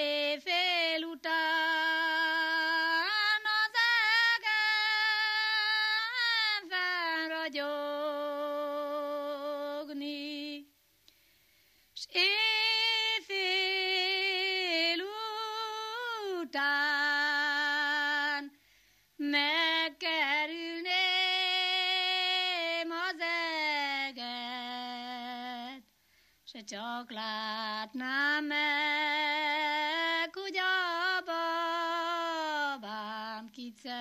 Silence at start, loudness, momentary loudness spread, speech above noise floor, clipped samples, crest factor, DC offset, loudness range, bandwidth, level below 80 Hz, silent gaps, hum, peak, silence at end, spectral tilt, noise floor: 0 s; -30 LUFS; 12 LU; 34 dB; under 0.1%; 18 dB; under 0.1%; 10 LU; 15 kHz; -84 dBFS; none; none; -14 dBFS; 0 s; -1 dB/octave; -68 dBFS